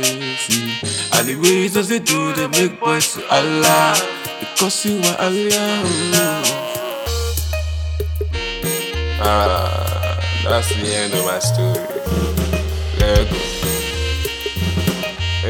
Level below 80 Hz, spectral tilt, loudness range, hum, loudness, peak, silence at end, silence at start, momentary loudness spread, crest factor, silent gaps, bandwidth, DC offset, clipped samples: -28 dBFS; -3.5 dB/octave; 4 LU; none; -18 LUFS; 0 dBFS; 0 s; 0 s; 8 LU; 18 dB; none; over 20 kHz; under 0.1%; under 0.1%